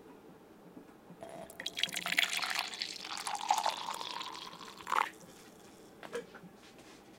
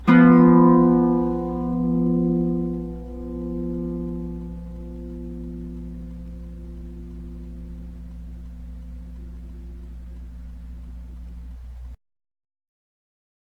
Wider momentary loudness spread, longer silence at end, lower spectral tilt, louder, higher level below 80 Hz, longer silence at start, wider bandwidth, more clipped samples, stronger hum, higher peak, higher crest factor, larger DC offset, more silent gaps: about the same, 24 LU vs 25 LU; second, 0 s vs 1.65 s; second, -0.5 dB/octave vs -10.5 dB/octave; second, -36 LUFS vs -19 LUFS; second, -76 dBFS vs -38 dBFS; about the same, 0 s vs 0 s; first, 17 kHz vs 4.1 kHz; neither; neither; second, -10 dBFS vs -2 dBFS; first, 30 dB vs 20 dB; neither; neither